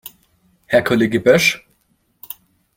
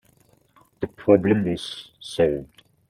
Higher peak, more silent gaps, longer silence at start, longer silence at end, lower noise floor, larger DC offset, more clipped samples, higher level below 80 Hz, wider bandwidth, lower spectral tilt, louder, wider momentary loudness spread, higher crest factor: about the same, -2 dBFS vs -2 dBFS; neither; second, 0.05 s vs 0.8 s; first, 1.2 s vs 0.45 s; about the same, -63 dBFS vs -60 dBFS; neither; neither; about the same, -54 dBFS vs -54 dBFS; first, 16.5 kHz vs 13 kHz; second, -4.5 dB/octave vs -6.5 dB/octave; first, -15 LUFS vs -23 LUFS; first, 22 LU vs 16 LU; about the same, 18 dB vs 22 dB